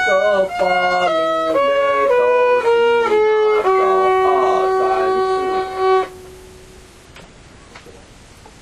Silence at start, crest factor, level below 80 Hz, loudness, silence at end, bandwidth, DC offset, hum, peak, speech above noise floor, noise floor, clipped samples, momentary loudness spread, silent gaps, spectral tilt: 0 s; 12 dB; -48 dBFS; -15 LUFS; 0.7 s; 12.5 kHz; under 0.1%; none; -4 dBFS; 26 dB; -42 dBFS; under 0.1%; 4 LU; none; -4.5 dB/octave